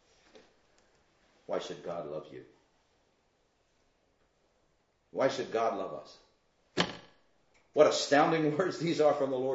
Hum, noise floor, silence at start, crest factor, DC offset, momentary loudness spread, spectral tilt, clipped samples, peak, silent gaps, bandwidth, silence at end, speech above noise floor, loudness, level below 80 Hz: none; -73 dBFS; 1.5 s; 24 dB; under 0.1%; 17 LU; -4.5 dB/octave; under 0.1%; -10 dBFS; none; 8 kHz; 0 s; 43 dB; -30 LUFS; -74 dBFS